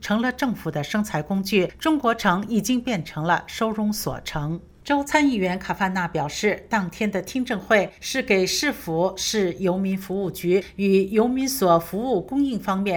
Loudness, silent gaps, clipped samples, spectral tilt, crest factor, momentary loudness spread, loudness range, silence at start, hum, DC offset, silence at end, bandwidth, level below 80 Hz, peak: -23 LUFS; none; under 0.1%; -4.5 dB/octave; 18 dB; 7 LU; 2 LU; 0 s; none; under 0.1%; 0 s; over 20 kHz; -50 dBFS; -4 dBFS